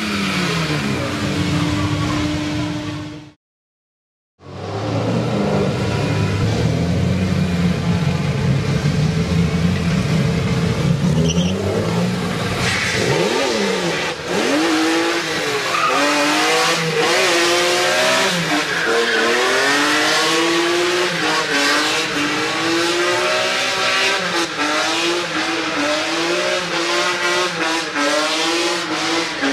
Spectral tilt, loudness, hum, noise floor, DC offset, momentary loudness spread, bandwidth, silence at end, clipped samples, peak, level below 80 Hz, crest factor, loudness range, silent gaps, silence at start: -4 dB/octave; -17 LUFS; none; under -90 dBFS; under 0.1%; 5 LU; 15.5 kHz; 0 s; under 0.1%; -4 dBFS; -40 dBFS; 14 dB; 7 LU; 3.36-4.38 s; 0 s